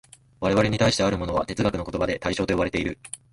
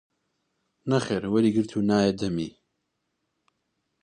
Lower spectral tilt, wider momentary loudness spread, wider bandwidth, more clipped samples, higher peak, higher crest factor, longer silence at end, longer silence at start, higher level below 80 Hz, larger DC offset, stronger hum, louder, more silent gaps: second, -5 dB/octave vs -6.5 dB/octave; about the same, 8 LU vs 10 LU; first, 11.5 kHz vs 9.8 kHz; neither; about the same, -8 dBFS vs -8 dBFS; about the same, 16 dB vs 20 dB; second, 0.15 s vs 1.55 s; second, 0.4 s vs 0.85 s; first, -42 dBFS vs -58 dBFS; neither; neither; about the same, -24 LUFS vs -25 LUFS; neither